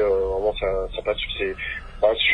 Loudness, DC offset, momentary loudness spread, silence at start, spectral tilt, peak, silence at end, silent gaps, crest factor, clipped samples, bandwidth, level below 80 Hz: -24 LUFS; under 0.1%; 6 LU; 0 s; -5.5 dB/octave; -6 dBFS; 0 s; none; 16 dB; under 0.1%; 9.4 kHz; -36 dBFS